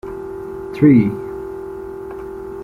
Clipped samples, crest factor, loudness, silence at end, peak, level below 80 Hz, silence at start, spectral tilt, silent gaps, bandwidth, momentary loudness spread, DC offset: under 0.1%; 18 dB; -17 LUFS; 0 s; -2 dBFS; -44 dBFS; 0.05 s; -10 dB/octave; none; 4.8 kHz; 18 LU; under 0.1%